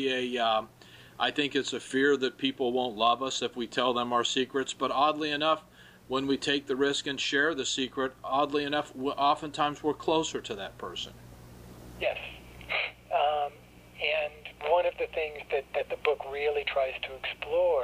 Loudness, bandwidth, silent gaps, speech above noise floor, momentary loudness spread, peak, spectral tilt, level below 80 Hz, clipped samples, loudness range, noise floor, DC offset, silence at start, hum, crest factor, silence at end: -29 LUFS; 15.5 kHz; none; 23 dB; 10 LU; -10 dBFS; -3 dB/octave; -60 dBFS; under 0.1%; 5 LU; -52 dBFS; under 0.1%; 0 s; none; 20 dB; 0 s